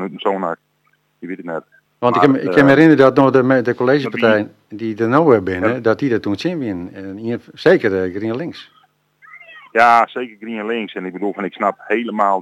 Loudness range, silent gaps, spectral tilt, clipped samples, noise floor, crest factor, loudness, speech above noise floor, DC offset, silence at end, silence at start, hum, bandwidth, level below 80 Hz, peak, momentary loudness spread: 6 LU; none; -7.5 dB/octave; under 0.1%; -62 dBFS; 16 dB; -16 LUFS; 46 dB; under 0.1%; 0 s; 0 s; 50 Hz at -50 dBFS; 10.5 kHz; -58 dBFS; 0 dBFS; 16 LU